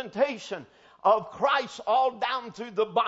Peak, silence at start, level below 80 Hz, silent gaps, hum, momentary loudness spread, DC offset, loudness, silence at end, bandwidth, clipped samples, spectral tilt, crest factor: -10 dBFS; 0 s; -72 dBFS; none; none; 11 LU; under 0.1%; -27 LUFS; 0 s; 8 kHz; under 0.1%; -4 dB/octave; 18 dB